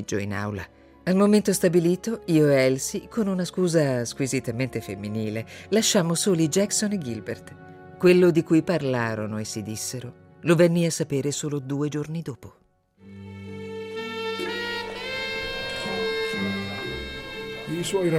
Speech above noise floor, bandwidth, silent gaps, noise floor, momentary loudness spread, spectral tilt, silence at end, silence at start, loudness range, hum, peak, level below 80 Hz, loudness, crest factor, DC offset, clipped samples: 32 dB; 16 kHz; none; -55 dBFS; 15 LU; -5 dB/octave; 0 s; 0 s; 9 LU; none; -8 dBFS; -54 dBFS; -24 LUFS; 18 dB; under 0.1%; under 0.1%